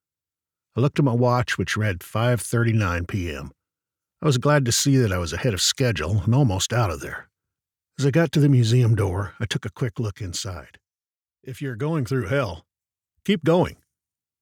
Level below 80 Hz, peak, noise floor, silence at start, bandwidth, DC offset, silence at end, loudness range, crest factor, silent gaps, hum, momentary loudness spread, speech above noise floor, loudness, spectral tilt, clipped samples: -46 dBFS; -6 dBFS; under -90 dBFS; 0.75 s; 18.5 kHz; under 0.1%; 0.7 s; 7 LU; 18 dB; none; none; 14 LU; over 68 dB; -22 LUFS; -5.5 dB/octave; under 0.1%